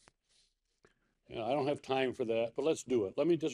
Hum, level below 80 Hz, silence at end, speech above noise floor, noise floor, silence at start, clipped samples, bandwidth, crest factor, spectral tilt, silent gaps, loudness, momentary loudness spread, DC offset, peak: none; -74 dBFS; 0 s; 41 dB; -75 dBFS; 1.3 s; under 0.1%; 11 kHz; 18 dB; -5.5 dB/octave; none; -34 LUFS; 4 LU; under 0.1%; -16 dBFS